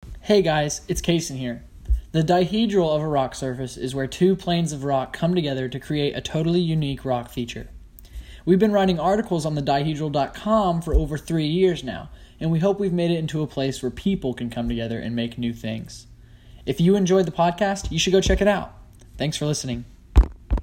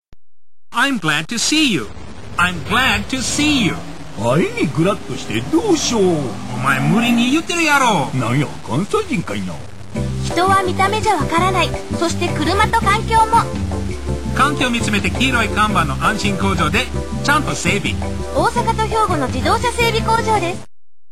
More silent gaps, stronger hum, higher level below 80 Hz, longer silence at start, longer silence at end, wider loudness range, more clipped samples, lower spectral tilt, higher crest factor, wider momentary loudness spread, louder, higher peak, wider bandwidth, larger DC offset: neither; neither; about the same, -32 dBFS vs -32 dBFS; about the same, 0.05 s vs 0 s; second, 0 s vs 0.45 s; about the same, 4 LU vs 2 LU; neither; first, -6 dB/octave vs -4.5 dB/octave; about the same, 20 dB vs 16 dB; first, 12 LU vs 9 LU; second, -23 LUFS vs -17 LUFS; about the same, -2 dBFS vs -2 dBFS; about the same, 16 kHz vs 16 kHz; second, under 0.1% vs 3%